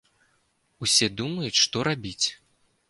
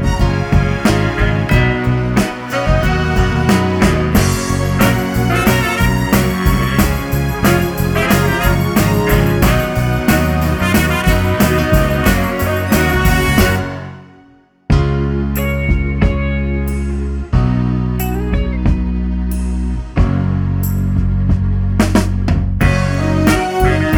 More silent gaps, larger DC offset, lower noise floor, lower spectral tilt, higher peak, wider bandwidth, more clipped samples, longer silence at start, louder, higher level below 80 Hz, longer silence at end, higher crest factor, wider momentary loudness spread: neither; neither; first, -69 dBFS vs -47 dBFS; second, -2 dB/octave vs -6 dB/octave; second, -6 dBFS vs 0 dBFS; second, 11.5 kHz vs over 20 kHz; neither; first, 0.8 s vs 0 s; second, -24 LUFS vs -15 LUFS; second, -58 dBFS vs -20 dBFS; first, 0.55 s vs 0 s; first, 22 dB vs 14 dB; first, 8 LU vs 5 LU